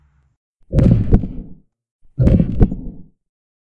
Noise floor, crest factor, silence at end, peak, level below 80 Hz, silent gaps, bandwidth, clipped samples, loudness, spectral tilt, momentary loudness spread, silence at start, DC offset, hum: -40 dBFS; 18 dB; 0.6 s; 0 dBFS; -22 dBFS; 1.91-1.99 s; 5 kHz; under 0.1%; -16 LUFS; -11 dB/octave; 21 LU; 0.7 s; under 0.1%; none